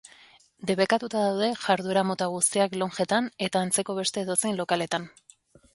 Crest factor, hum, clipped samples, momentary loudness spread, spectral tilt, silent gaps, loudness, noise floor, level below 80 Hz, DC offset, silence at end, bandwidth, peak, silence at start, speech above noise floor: 20 dB; none; under 0.1%; 5 LU; -3.5 dB/octave; none; -26 LUFS; -57 dBFS; -70 dBFS; under 0.1%; 0.65 s; 12 kHz; -6 dBFS; 0.05 s; 31 dB